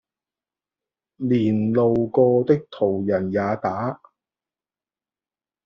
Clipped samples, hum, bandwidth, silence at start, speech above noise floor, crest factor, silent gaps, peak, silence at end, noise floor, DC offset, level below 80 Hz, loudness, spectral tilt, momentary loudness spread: under 0.1%; none; 6.4 kHz; 1.2 s; over 70 dB; 18 dB; none; -4 dBFS; 1.7 s; under -90 dBFS; under 0.1%; -60 dBFS; -21 LUFS; -8 dB/octave; 10 LU